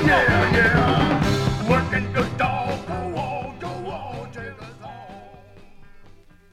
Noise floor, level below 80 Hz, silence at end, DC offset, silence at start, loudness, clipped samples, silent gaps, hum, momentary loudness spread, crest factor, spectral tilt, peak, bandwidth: -47 dBFS; -38 dBFS; 0.45 s; under 0.1%; 0 s; -21 LUFS; under 0.1%; none; none; 22 LU; 18 dB; -6 dB/octave; -6 dBFS; 15 kHz